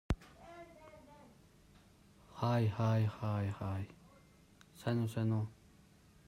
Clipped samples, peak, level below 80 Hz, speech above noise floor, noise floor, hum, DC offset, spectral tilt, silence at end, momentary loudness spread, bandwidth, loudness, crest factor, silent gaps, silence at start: under 0.1%; -20 dBFS; -56 dBFS; 29 dB; -64 dBFS; none; under 0.1%; -8 dB/octave; 0.75 s; 23 LU; 13.5 kHz; -37 LUFS; 18 dB; none; 0.1 s